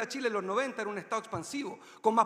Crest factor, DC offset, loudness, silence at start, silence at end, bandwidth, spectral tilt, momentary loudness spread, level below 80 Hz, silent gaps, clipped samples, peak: 22 dB; under 0.1%; -34 LUFS; 0 s; 0 s; 15.5 kHz; -4 dB/octave; 7 LU; -74 dBFS; none; under 0.1%; -12 dBFS